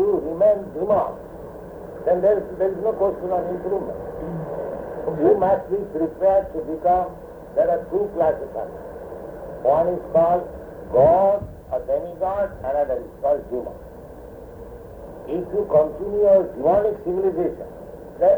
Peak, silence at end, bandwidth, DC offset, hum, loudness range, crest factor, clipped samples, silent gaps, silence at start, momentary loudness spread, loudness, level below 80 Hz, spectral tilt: -6 dBFS; 0 s; over 20 kHz; under 0.1%; none; 5 LU; 16 dB; under 0.1%; none; 0 s; 19 LU; -22 LUFS; -46 dBFS; -9.5 dB/octave